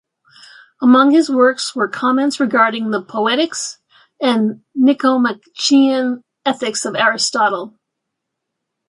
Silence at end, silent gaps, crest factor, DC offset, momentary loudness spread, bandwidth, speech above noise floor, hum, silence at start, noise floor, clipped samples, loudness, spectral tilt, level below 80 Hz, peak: 1.2 s; none; 16 dB; under 0.1%; 9 LU; 11.5 kHz; 63 dB; none; 0.8 s; -78 dBFS; under 0.1%; -15 LUFS; -3 dB/octave; -70 dBFS; -2 dBFS